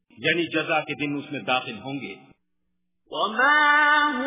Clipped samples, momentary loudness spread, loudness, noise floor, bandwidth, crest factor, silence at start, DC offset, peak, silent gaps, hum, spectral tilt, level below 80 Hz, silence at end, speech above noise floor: under 0.1%; 17 LU; -21 LUFS; -79 dBFS; 3.9 kHz; 18 dB; 0.2 s; under 0.1%; -8 dBFS; none; none; -1 dB/octave; -70 dBFS; 0 s; 56 dB